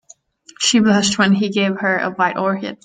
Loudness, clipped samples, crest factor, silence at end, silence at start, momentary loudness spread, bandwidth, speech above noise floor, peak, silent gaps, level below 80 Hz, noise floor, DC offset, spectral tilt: -16 LUFS; under 0.1%; 16 dB; 0.1 s; 0.6 s; 5 LU; 9.6 kHz; 30 dB; -2 dBFS; none; -58 dBFS; -47 dBFS; under 0.1%; -4 dB/octave